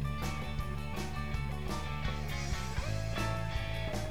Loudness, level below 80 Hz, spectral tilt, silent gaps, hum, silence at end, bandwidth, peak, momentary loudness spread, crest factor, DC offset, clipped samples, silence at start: -37 LUFS; -40 dBFS; -5.5 dB/octave; none; none; 0 s; 19 kHz; -22 dBFS; 4 LU; 14 dB; 0.7%; under 0.1%; 0 s